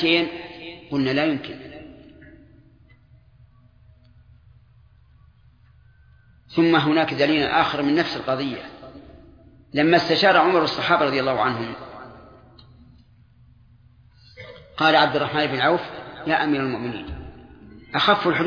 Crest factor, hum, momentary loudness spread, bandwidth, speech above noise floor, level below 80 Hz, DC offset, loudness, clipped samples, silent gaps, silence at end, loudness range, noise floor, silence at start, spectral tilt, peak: 20 dB; none; 23 LU; 5.2 kHz; 33 dB; -52 dBFS; under 0.1%; -20 LUFS; under 0.1%; none; 0 s; 9 LU; -54 dBFS; 0 s; -6 dB/octave; -2 dBFS